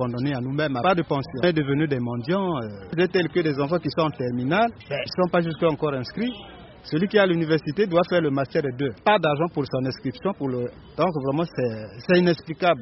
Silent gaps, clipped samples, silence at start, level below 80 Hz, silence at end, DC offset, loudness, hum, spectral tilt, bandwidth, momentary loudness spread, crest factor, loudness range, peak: none; under 0.1%; 0 s; -54 dBFS; 0 s; under 0.1%; -24 LUFS; none; -5 dB/octave; 6 kHz; 9 LU; 18 dB; 2 LU; -6 dBFS